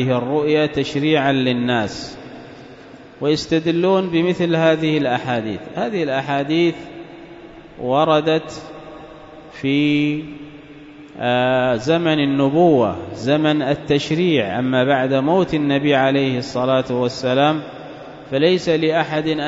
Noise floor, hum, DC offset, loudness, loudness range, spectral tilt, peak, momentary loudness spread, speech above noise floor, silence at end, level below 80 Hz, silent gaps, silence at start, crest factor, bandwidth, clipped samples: -40 dBFS; none; under 0.1%; -18 LUFS; 4 LU; -6.5 dB/octave; -2 dBFS; 20 LU; 23 dB; 0 s; -52 dBFS; none; 0 s; 16 dB; 7.8 kHz; under 0.1%